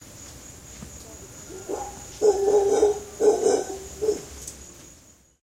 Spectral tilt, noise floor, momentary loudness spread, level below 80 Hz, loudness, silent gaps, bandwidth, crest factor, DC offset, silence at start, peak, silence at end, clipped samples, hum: -4 dB/octave; -53 dBFS; 22 LU; -50 dBFS; -23 LUFS; none; 16 kHz; 18 dB; under 0.1%; 0.05 s; -8 dBFS; 0.7 s; under 0.1%; none